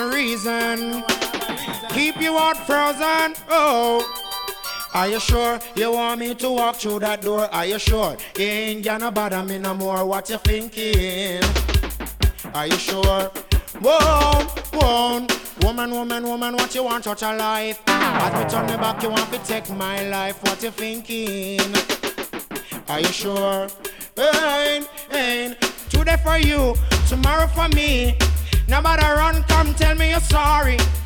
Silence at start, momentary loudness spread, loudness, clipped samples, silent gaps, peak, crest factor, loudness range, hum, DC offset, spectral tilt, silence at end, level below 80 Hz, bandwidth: 0 s; 8 LU; -20 LUFS; under 0.1%; none; -6 dBFS; 14 dB; 5 LU; none; under 0.1%; -4 dB/octave; 0 s; -26 dBFS; over 20 kHz